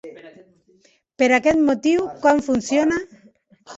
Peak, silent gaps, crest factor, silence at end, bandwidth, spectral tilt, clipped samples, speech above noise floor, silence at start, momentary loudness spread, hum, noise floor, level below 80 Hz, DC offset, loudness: -4 dBFS; none; 18 dB; 0 s; 8 kHz; -4.5 dB/octave; under 0.1%; 40 dB; 0.05 s; 10 LU; none; -58 dBFS; -54 dBFS; under 0.1%; -19 LUFS